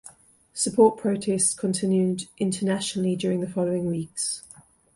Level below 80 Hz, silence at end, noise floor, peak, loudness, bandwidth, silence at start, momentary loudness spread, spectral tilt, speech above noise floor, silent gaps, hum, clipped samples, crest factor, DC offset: -62 dBFS; 0.55 s; -53 dBFS; -6 dBFS; -24 LUFS; 11.5 kHz; 0.05 s; 9 LU; -5 dB/octave; 29 dB; none; none; under 0.1%; 18 dB; under 0.1%